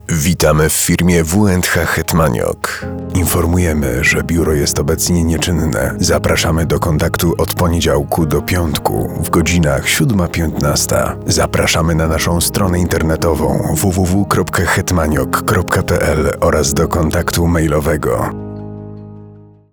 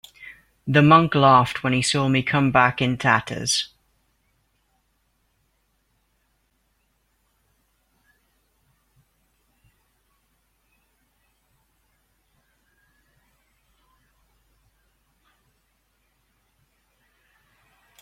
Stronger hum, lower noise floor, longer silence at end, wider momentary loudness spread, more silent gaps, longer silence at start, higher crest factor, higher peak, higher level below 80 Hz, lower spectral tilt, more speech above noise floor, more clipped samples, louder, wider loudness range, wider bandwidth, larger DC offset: neither; second, -38 dBFS vs -69 dBFS; second, 0.3 s vs 14.35 s; second, 5 LU vs 21 LU; neither; second, 0.05 s vs 0.2 s; second, 14 dB vs 24 dB; about the same, 0 dBFS vs -2 dBFS; first, -26 dBFS vs -58 dBFS; about the same, -5 dB/octave vs -5 dB/octave; second, 25 dB vs 50 dB; neither; first, -14 LUFS vs -19 LUFS; second, 1 LU vs 13 LU; first, over 20 kHz vs 12.5 kHz; first, 0.3% vs under 0.1%